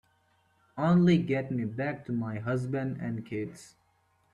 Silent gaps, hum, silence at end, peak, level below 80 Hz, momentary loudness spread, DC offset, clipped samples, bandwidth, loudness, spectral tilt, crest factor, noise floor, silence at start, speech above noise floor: none; none; 0.65 s; -12 dBFS; -64 dBFS; 14 LU; under 0.1%; under 0.1%; 10.5 kHz; -30 LUFS; -8 dB/octave; 18 dB; -70 dBFS; 0.75 s; 41 dB